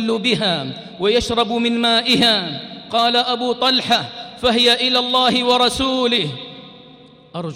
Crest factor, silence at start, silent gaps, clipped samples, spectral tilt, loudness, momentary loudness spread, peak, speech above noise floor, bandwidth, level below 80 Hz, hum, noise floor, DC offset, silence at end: 14 dB; 0 s; none; under 0.1%; -3.5 dB/octave; -16 LUFS; 15 LU; -4 dBFS; 27 dB; 16 kHz; -46 dBFS; none; -44 dBFS; under 0.1%; 0 s